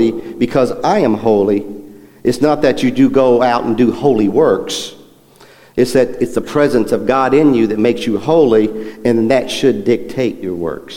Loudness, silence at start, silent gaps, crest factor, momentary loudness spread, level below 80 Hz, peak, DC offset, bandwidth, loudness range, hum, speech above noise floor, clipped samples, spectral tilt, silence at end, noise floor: -14 LUFS; 0 s; none; 12 dB; 9 LU; -42 dBFS; 0 dBFS; under 0.1%; 16.5 kHz; 2 LU; none; 31 dB; under 0.1%; -6 dB/octave; 0 s; -44 dBFS